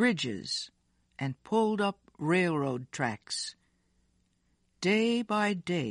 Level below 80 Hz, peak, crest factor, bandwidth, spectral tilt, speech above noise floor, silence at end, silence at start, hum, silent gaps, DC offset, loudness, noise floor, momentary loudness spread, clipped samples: -72 dBFS; -14 dBFS; 18 dB; 11 kHz; -5 dB/octave; 43 dB; 0 s; 0 s; none; none; under 0.1%; -31 LUFS; -73 dBFS; 10 LU; under 0.1%